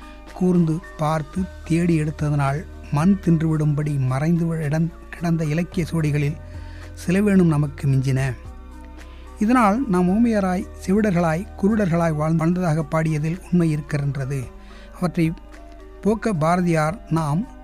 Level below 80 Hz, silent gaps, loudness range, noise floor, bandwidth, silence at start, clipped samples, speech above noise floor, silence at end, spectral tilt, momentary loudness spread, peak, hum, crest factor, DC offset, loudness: -40 dBFS; none; 3 LU; -40 dBFS; 13.5 kHz; 0 s; under 0.1%; 20 dB; 0 s; -8 dB/octave; 12 LU; -6 dBFS; none; 14 dB; under 0.1%; -21 LUFS